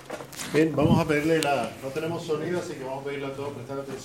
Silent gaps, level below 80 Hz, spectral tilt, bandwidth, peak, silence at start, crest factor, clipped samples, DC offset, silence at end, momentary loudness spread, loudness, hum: none; -52 dBFS; -5.5 dB/octave; 16.5 kHz; -6 dBFS; 0 s; 22 dB; under 0.1%; under 0.1%; 0 s; 13 LU; -27 LUFS; none